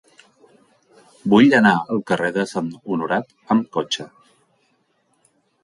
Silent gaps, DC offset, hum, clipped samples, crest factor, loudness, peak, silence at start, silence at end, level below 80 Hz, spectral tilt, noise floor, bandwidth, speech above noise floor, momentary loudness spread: none; under 0.1%; none; under 0.1%; 18 dB; -19 LUFS; -2 dBFS; 1.25 s; 1.55 s; -62 dBFS; -5.5 dB/octave; -65 dBFS; 11.5 kHz; 47 dB; 14 LU